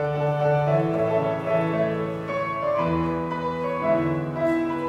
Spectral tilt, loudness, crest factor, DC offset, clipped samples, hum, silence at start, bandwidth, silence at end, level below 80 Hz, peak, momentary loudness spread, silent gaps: -8.5 dB/octave; -24 LUFS; 14 dB; under 0.1%; under 0.1%; none; 0 s; 9.8 kHz; 0 s; -54 dBFS; -10 dBFS; 5 LU; none